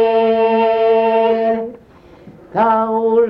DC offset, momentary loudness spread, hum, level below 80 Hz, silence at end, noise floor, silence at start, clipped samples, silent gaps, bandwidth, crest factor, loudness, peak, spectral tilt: under 0.1%; 8 LU; none; -54 dBFS; 0 s; -43 dBFS; 0 s; under 0.1%; none; 5.4 kHz; 12 dB; -15 LUFS; -4 dBFS; -7.5 dB/octave